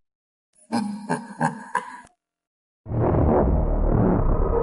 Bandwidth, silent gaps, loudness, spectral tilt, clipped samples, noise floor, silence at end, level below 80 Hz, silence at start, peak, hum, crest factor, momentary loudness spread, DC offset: 11.5 kHz; 2.47-2.84 s; -24 LUFS; -8 dB/octave; under 0.1%; -51 dBFS; 0 s; -28 dBFS; 0.7 s; -6 dBFS; none; 16 dB; 10 LU; under 0.1%